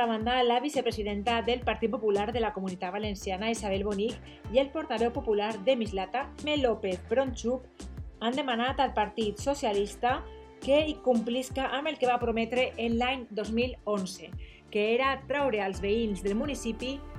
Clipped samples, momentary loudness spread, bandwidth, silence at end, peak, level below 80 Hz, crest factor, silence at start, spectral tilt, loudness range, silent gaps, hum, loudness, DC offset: under 0.1%; 7 LU; 14.5 kHz; 0 s; -12 dBFS; -48 dBFS; 18 dB; 0 s; -5 dB/octave; 2 LU; none; none; -30 LUFS; under 0.1%